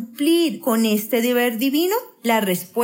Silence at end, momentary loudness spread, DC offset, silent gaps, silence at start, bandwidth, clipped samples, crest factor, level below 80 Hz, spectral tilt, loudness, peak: 0 s; 4 LU; under 0.1%; none; 0 s; 16.5 kHz; under 0.1%; 14 dB; -84 dBFS; -4 dB/octave; -20 LUFS; -6 dBFS